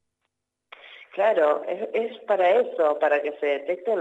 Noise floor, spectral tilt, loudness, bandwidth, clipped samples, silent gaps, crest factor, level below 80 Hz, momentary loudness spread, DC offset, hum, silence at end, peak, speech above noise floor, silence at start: -80 dBFS; -5 dB/octave; -23 LUFS; 7.8 kHz; under 0.1%; none; 14 dB; -86 dBFS; 8 LU; under 0.1%; 50 Hz at -85 dBFS; 0 s; -10 dBFS; 57 dB; 0.85 s